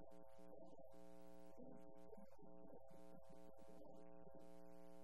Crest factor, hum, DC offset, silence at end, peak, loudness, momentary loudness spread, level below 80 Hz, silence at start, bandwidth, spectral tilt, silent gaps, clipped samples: 14 dB; 60 Hz at -75 dBFS; 0.2%; 0 s; -46 dBFS; -65 LUFS; 2 LU; -80 dBFS; 0 s; 13 kHz; -7 dB/octave; none; under 0.1%